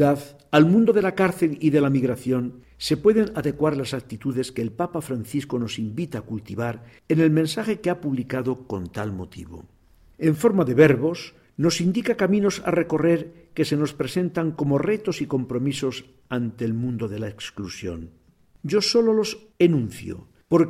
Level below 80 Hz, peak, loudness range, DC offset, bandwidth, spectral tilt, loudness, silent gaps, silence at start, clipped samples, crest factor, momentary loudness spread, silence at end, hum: -54 dBFS; -4 dBFS; 7 LU; under 0.1%; 15.5 kHz; -6.5 dB/octave; -23 LUFS; none; 0 s; under 0.1%; 20 dB; 14 LU; 0 s; none